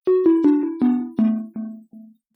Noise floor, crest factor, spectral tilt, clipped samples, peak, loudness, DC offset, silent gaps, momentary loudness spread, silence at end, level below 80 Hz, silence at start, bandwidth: -46 dBFS; 14 dB; -10.5 dB/octave; under 0.1%; -6 dBFS; -19 LUFS; under 0.1%; none; 16 LU; 0.35 s; -68 dBFS; 0.05 s; 4.3 kHz